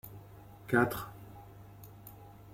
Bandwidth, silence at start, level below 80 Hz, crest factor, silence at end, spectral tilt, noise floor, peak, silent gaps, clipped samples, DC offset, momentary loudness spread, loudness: 16.5 kHz; 0.05 s; -60 dBFS; 24 dB; 0.05 s; -6.5 dB/octave; -53 dBFS; -14 dBFS; none; under 0.1%; under 0.1%; 24 LU; -32 LUFS